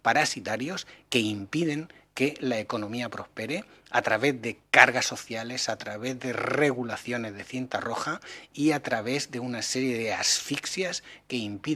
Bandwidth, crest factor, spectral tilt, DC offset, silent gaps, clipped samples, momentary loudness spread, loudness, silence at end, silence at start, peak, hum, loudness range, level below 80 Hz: 15.5 kHz; 28 dB; -3 dB/octave; under 0.1%; none; under 0.1%; 11 LU; -28 LUFS; 0 s; 0.05 s; 0 dBFS; none; 5 LU; -68 dBFS